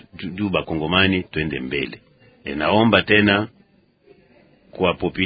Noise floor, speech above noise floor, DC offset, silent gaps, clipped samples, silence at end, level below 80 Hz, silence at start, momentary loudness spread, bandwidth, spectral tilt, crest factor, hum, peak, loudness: -57 dBFS; 37 dB; under 0.1%; none; under 0.1%; 0 s; -44 dBFS; 0.15 s; 15 LU; 5 kHz; -9 dB/octave; 22 dB; none; 0 dBFS; -19 LUFS